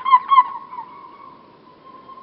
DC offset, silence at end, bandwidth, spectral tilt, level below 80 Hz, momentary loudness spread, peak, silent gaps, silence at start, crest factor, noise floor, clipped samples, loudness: under 0.1%; 0.1 s; 5 kHz; 1.5 dB/octave; -74 dBFS; 26 LU; 0 dBFS; none; 0 s; 20 dB; -47 dBFS; under 0.1%; -15 LUFS